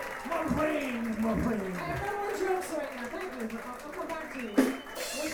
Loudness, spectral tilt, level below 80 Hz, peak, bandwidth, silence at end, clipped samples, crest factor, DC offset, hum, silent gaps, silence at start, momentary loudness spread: -33 LUFS; -5 dB/octave; -52 dBFS; -12 dBFS; over 20 kHz; 0 s; under 0.1%; 20 dB; under 0.1%; none; none; 0 s; 9 LU